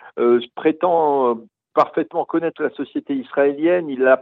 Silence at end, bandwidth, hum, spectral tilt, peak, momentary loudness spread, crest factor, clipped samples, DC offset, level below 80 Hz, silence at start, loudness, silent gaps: 0 s; 5.6 kHz; none; -8 dB/octave; -2 dBFS; 8 LU; 16 dB; under 0.1%; under 0.1%; -72 dBFS; 0.05 s; -20 LUFS; none